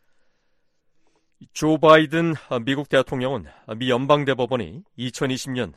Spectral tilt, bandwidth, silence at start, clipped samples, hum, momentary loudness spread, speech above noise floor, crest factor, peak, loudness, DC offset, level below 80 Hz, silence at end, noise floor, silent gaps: -5.5 dB/octave; 13 kHz; 1.4 s; under 0.1%; none; 17 LU; 45 dB; 20 dB; -2 dBFS; -21 LUFS; under 0.1%; -54 dBFS; 0.05 s; -66 dBFS; none